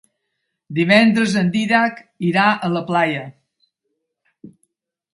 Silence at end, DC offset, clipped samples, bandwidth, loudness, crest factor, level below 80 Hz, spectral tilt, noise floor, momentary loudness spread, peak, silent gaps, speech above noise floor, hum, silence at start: 0.65 s; under 0.1%; under 0.1%; 11.5 kHz; -17 LUFS; 18 dB; -62 dBFS; -6 dB/octave; -75 dBFS; 12 LU; 0 dBFS; none; 59 dB; none; 0.7 s